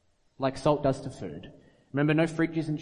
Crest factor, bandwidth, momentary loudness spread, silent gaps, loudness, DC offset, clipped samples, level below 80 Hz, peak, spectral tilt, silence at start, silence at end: 18 dB; 10.5 kHz; 15 LU; none; -28 LUFS; under 0.1%; under 0.1%; -56 dBFS; -10 dBFS; -7 dB/octave; 0.4 s; 0 s